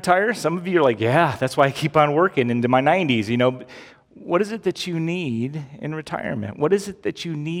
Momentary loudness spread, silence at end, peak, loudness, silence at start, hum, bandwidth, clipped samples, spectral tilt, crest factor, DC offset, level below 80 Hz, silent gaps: 11 LU; 0 s; -2 dBFS; -21 LUFS; 0 s; none; 16 kHz; under 0.1%; -6 dB/octave; 20 dB; under 0.1%; -60 dBFS; none